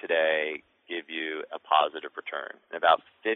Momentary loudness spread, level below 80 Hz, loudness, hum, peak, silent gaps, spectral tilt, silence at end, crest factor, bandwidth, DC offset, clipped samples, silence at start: 13 LU; -80 dBFS; -28 LUFS; none; -8 dBFS; none; -6 dB/octave; 0 s; 20 dB; 4.1 kHz; under 0.1%; under 0.1%; 0.05 s